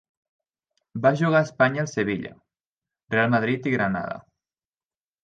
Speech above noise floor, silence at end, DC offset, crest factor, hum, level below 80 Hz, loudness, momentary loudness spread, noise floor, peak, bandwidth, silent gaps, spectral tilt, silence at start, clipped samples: over 67 dB; 1.05 s; under 0.1%; 20 dB; none; -62 dBFS; -23 LUFS; 14 LU; under -90 dBFS; -6 dBFS; 8.8 kHz; 2.71-2.82 s; -6.5 dB/octave; 0.95 s; under 0.1%